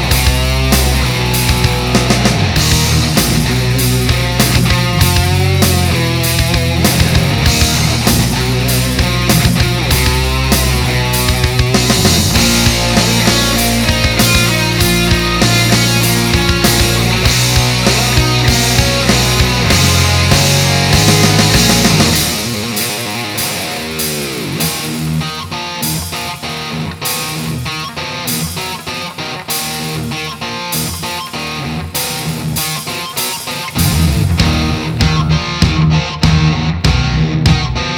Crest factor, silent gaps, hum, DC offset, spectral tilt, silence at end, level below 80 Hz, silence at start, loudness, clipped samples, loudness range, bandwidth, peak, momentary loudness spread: 12 dB; none; none; under 0.1%; -4 dB/octave; 0 s; -22 dBFS; 0 s; -12 LUFS; under 0.1%; 8 LU; over 20 kHz; 0 dBFS; 10 LU